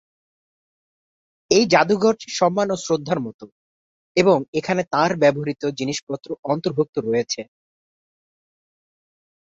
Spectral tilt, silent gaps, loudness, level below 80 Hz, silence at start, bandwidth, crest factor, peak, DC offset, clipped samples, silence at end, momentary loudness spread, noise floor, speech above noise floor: -4.5 dB/octave; 3.34-3.39 s, 3.52-4.15 s, 4.48-4.53 s, 6.03-6.07 s, 6.39-6.43 s, 6.89-6.93 s; -21 LUFS; -62 dBFS; 1.5 s; 8 kHz; 20 dB; -2 dBFS; under 0.1%; under 0.1%; 2 s; 11 LU; under -90 dBFS; over 70 dB